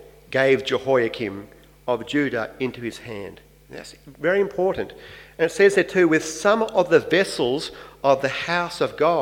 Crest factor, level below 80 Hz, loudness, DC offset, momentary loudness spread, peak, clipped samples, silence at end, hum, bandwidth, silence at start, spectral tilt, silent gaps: 18 dB; -56 dBFS; -21 LUFS; under 0.1%; 19 LU; -4 dBFS; under 0.1%; 0 s; none; 16.5 kHz; 0.05 s; -4.5 dB/octave; none